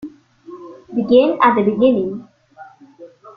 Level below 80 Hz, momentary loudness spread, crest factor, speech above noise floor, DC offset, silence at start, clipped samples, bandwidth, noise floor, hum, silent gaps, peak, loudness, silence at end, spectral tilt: -58 dBFS; 24 LU; 16 dB; 29 dB; under 0.1%; 0 s; under 0.1%; 5 kHz; -43 dBFS; none; none; -2 dBFS; -15 LUFS; 0.05 s; -8.5 dB/octave